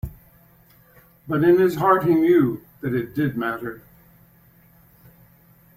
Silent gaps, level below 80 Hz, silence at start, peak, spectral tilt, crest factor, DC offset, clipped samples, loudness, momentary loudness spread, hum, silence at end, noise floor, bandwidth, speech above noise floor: none; -50 dBFS; 0.05 s; -4 dBFS; -8.5 dB/octave; 18 dB; under 0.1%; under 0.1%; -20 LUFS; 14 LU; none; 2 s; -54 dBFS; 16 kHz; 35 dB